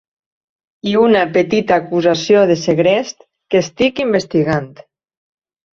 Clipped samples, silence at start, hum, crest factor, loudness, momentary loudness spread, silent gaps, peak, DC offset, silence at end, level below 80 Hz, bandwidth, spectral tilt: under 0.1%; 0.85 s; none; 16 dB; -14 LUFS; 7 LU; none; 0 dBFS; under 0.1%; 1.05 s; -52 dBFS; 7.6 kHz; -5.5 dB/octave